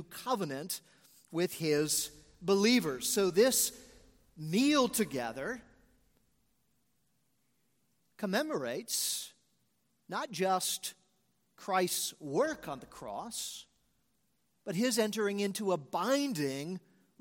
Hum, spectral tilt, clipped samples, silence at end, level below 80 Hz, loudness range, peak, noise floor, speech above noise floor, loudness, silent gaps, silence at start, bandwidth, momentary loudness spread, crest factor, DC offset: none; -3.5 dB/octave; under 0.1%; 0.45 s; -70 dBFS; 8 LU; -14 dBFS; -78 dBFS; 45 dB; -32 LUFS; none; 0 s; 17 kHz; 15 LU; 20 dB; under 0.1%